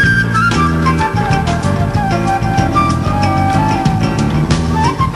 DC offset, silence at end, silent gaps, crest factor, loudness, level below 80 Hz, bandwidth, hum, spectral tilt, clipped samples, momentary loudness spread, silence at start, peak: under 0.1%; 0 s; none; 12 dB; -13 LUFS; -26 dBFS; 13 kHz; none; -6 dB/octave; under 0.1%; 3 LU; 0 s; 0 dBFS